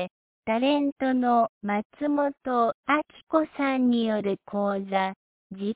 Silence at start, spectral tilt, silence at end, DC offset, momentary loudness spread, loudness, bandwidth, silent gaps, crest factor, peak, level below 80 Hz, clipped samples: 0 s; -9.5 dB/octave; 0 s; under 0.1%; 7 LU; -26 LUFS; 4 kHz; 0.10-0.43 s, 0.92-0.96 s, 1.49-1.61 s, 1.85-1.90 s, 2.74-2.83 s, 3.23-3.27 s, 5.16-5.50 s; 16 dB; -10 dBFS; -68 dBFS; under 0.1%